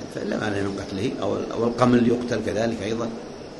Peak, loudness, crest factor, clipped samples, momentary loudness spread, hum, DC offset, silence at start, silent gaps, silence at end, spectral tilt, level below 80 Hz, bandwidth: -4 dBFS; -24 LUFS; 20 dB; under 0.1%; 10 LU; none; under 0.1%; 0 s; none; 0 s; -6 dB/octave; -50 dBFS; 11.5 kHz